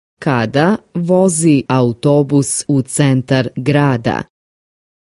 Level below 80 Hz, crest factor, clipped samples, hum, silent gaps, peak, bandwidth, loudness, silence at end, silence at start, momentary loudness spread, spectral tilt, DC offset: -50 dBFS; 14 dB; under 0.1%; none; none; 0 dBFS; 11.5 kHz; -14 LUFS; 0.95 s; 0.2 s; 6 LU; -6 dB/octave; under 0.1%